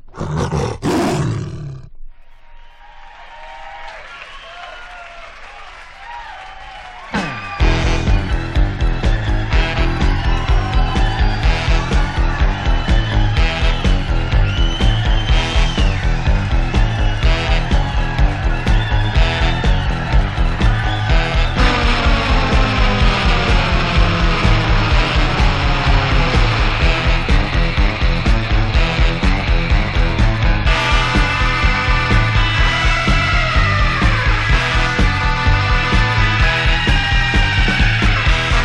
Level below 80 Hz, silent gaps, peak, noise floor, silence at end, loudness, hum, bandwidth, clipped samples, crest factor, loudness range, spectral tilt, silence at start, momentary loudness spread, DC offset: -16 dBFS; none; 0 dBFS; -37 dBFS; 0 s; -16 LUFS; none; 9.2 kHz; under 0.1%; 14 dB; 12 LU; -5.5 dB/octave; 0.05 s; 16 LU; under 0.1%